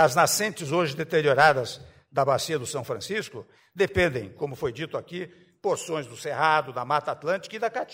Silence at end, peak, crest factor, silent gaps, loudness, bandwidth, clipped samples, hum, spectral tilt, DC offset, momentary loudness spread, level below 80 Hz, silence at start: 0 s; -6 dBFS; 20 dB; none; -26 LUFS; 16 kHz; under 0.1%; none; -4 dB/octave; under 0.1%; 15 LU; -54 dBFS; 0 s